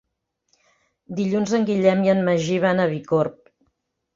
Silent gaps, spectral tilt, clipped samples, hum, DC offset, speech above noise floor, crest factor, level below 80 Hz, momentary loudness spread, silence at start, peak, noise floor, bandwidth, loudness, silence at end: none; -6.5 dB/octave; under 0.1%; none; under 0.1%; 56 dB; 18 dB; -62 dBFS; 7 LU; 1.1 s; -4 dBFS; -76 dBFS; 7.6 kHz; -21 LUFS; 0.85 s